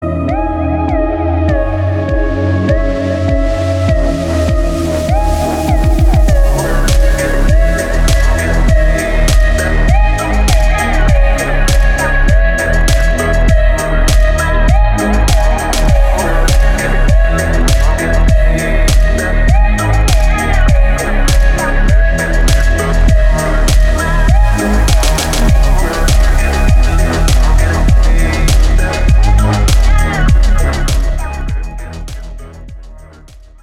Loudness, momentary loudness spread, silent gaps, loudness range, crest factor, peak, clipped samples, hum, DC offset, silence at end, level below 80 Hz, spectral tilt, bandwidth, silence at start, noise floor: -12 LUFS; 3 LU; none; 2 LU; 10 dB; 0 dBFS; under 0.1%; none; under 0.1%; 0.25 s; -10 dBFS; -5.5 dB/octave; 14.5 kHz; 0 s; -36 dBFS